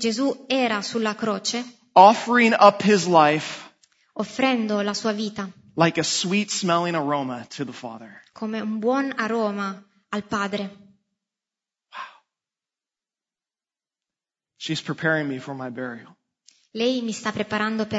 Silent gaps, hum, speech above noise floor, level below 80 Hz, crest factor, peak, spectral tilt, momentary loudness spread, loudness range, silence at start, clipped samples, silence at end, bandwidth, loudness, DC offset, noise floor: none; none; over 68 dB; -70 dBFS; 22 dB; 0 dBFS; -4 dB/octave; 20 LU; 15 LU; 0 s; under 0.1%; 0 s; 8 kHz; -22 LUFS; under 0.1%; under -90 dBFS